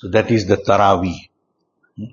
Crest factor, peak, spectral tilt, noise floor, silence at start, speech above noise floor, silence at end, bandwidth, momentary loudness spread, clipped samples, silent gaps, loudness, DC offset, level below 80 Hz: 18 dB; 0 dBFS; -6.5 dB/octave; -69 dBFS; 0 s; 53 dB; 0.05 s; 7.4 kHz; 18 LU; under 0.1%; none; -16 LUFS; under 0.1%; -48 dBFS